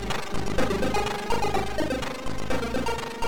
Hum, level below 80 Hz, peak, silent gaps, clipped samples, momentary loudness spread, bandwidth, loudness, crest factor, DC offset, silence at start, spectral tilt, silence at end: none; -38 dBFS; -12 dBFS; none; under 0.1%; 5 LU; 19 kHz; -28 LUFS; 14 dB; 3%; 0 s; -4.5 dB/octave; 0 s